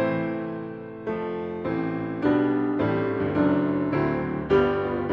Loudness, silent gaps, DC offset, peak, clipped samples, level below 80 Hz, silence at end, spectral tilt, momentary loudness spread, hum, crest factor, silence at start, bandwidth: -25 LUFS; none; under 0.1%; -8 dBFS; under 0.1%; -50 dBFS; 0 s; -9.5 dB/octave; 9 LU; none; 16 dB; 0 s; 5.6 kHz